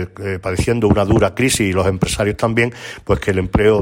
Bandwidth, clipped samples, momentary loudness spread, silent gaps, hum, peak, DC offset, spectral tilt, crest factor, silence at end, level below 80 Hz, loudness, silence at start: 16.5 kHz; under 0.1%; 7 LU; none; none; -2 dBFS; under 0.1%; -5.5 dB/octave; 14 dB; 0 s; -32 dBFS; -17 LUFS; 0 s